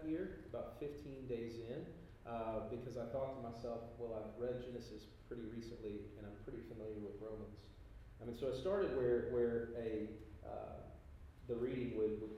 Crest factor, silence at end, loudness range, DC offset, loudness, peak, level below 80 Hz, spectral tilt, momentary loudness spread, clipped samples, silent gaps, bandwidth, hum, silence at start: 18 dB; 0 s; 8 LU; under 0.1%; -45 LUFS; -26 dBFS; -60 dBFS; -8 dB/octave; 16 LU; under 0.1%; none; 14 kHz; none; 0 s